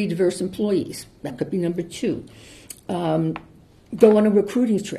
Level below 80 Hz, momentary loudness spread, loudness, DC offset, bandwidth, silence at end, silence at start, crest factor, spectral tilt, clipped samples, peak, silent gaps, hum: -56 dBFS; 19 LU; -21 LUFS; under 0.1%; 13 kHz; 0 s; 0 s; 20 dB; -6.5 dB/octave; under 0.1%; -2 dBFS; none; none